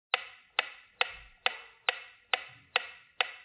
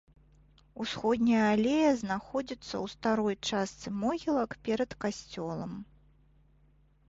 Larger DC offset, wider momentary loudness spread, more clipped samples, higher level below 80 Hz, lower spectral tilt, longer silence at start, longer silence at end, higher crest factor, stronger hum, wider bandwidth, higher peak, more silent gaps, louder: neither; second, 1 LU vs 13 LU; neither; second, -70 dBFS vs -60 dBFS; second, 4.5 dB/octave vs -5 dB/octave; second, 0.15 s vs 0.75 s; second, 0 s vs 1.25 s; first, 26 dB vs 16 dB; neither; second, 4 kHz vs 8 kHz; first, -10 dBFS vs -16 dBFS; neither; second, -34 LUFS vs -31 LUFS